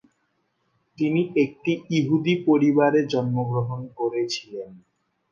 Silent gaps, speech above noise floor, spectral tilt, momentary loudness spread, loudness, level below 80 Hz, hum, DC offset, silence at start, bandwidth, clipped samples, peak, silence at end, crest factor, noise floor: none; 49 dB; -7 dB/octave; 12 LU; -23 LUFS; -68 dBFS; none; under 0.1%; 1 s; 7.4 kHz; under 0.1%; -8 dBFS; 0.55 s; 16 dB; -71 dBFS